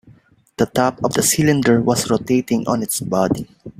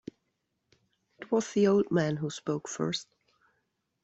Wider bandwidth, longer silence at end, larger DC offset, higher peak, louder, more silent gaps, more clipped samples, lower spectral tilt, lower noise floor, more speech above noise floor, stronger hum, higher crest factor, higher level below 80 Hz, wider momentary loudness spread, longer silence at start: first, 16 kHz vs 8.2 kHz; second, 0.1 s vs 1 s; neither; first, -2 dBFS vs -14 dBFS; first, -18 LUFS vs -29 LUFS; neither; neither; about the same, -4.5 dB/octave vs -5.5 dB/octave; second, -50 dBFS vs -80 dBFS; second, 33 dB vs 52 dB; neither; about the same, 16 dB vs 18 dB; first, -50 dBFS vs -70 dBFS; second, 6 LU vs 12 LU; second, 0.05 s vs 1.2 s